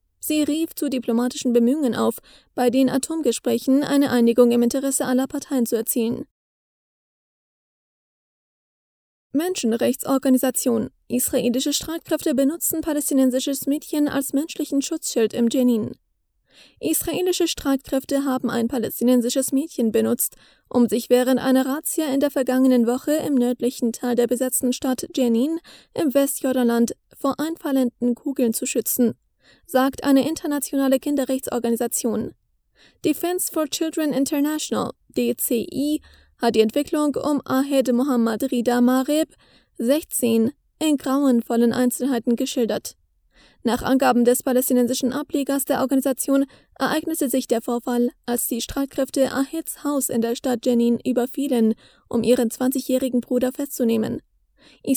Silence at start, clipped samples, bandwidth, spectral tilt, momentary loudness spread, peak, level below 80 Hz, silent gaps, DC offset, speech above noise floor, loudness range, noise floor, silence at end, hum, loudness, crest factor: 0.25 s; under 0.1%; over 20 kHz; -4 dB/octave; 6 LU; -2 dBFS; -56 dBFS; 6.31-9.30 s; under 0.1%; 45 dB; 4 LU; -66 dBFS; 0 s; none; -21 LUFS; 18 dB